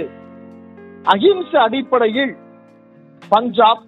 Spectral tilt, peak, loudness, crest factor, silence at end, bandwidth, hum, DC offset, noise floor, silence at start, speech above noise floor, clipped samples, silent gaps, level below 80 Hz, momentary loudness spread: -6.5 dB/octave; 0 dBFS; -16 LUFS; 18 dB; 0.1 s; 7.6 kHz; none; under 0.1%; -46 dBFS; 0 s; 31 dB; under 0.1%; none; -66 dBFS; 9 LU